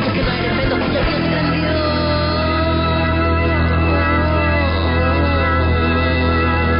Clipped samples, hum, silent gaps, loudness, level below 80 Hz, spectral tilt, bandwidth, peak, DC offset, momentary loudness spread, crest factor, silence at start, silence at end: under 0.1%; none; none; -16 LUFS; -22 dBFS; -11.5 dB/octave; 5.4 kHz; -6 dBFS; under 0.1%; 2 LU; 10 dB; 0 s; 0 s